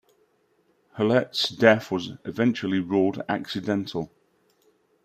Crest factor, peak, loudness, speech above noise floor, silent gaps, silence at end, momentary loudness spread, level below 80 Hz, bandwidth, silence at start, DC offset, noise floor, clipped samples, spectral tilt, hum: 22 dB; -4 dBFS; -24 LUFS; 43 dB; none; 0.95 s; 14 LU; -68 dBFS; 15 kHz; 0.95 s; under 0.1%; -67 dBFS; under 0.1%; -5.5 dB/octave; none